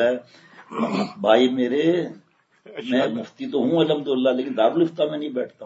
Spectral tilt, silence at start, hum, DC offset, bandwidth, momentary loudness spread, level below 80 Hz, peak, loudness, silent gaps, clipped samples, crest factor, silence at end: -6.5 dB/octave; 0 s; none; under 0.1%; 8 kHz; 12 LU; -74 dBFS; -2 dBFS; -22 LUFS; none; under 0.1%; 20 dB; 0 s